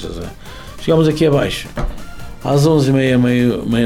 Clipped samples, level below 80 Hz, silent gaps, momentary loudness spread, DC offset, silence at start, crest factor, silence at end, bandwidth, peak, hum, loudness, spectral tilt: under 0.1%; -32 dBFS; none; 20 LU; under 0.1%; 0 s; 12 dB; 0 s; 16 kHz; -4 dBFS; none; -15 LUFS; -6.5 dB/octave